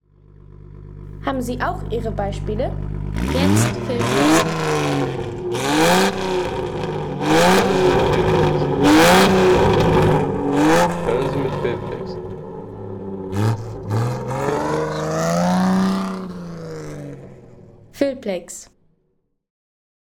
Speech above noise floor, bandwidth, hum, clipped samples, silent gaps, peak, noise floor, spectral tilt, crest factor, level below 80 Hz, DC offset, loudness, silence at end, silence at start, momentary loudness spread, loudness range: 47 dB; over 20 kHz; none; under 0.1%; none; -4 dBFS; -67 dBFS; -5.5 dB/octave; 14 dB; -36 dBFS; under 0.1%; -18 LUFS; 1.4 s; 0.7 s; 17 LU; 10 LU